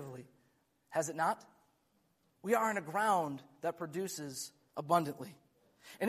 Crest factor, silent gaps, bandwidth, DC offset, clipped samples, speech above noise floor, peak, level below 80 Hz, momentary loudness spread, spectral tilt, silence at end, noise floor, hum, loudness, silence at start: 22 dB; none; 15.5 kHz; under 0.1%; under 0.1%; 40 dB; -16 dBFS; -82 dBFS; 16 LU; -4.5 dB/octave; 0 s; -76 dBFS; none; -36 LUFS; 0 s